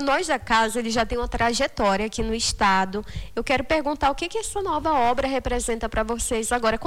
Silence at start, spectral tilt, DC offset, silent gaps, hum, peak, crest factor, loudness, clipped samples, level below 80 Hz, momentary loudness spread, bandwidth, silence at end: 0 s; -3.5 dB/octave; under 0.1%; none; none; -10 dBFS; 14 dB; -23 LUFS; under 0.1%; -38 dBFS; 6 LU; 18 kHz; 0 s